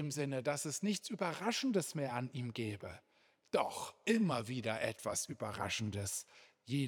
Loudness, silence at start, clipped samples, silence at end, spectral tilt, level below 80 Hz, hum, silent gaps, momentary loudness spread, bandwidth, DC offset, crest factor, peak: -38 LUFS; 0 s; under 0.1%; 0 s; -4.5 dB/octave; -78 dBFS; none; none; 8 LU; over 20 kHz; under 0.1%; 22 dB; -18 dBFS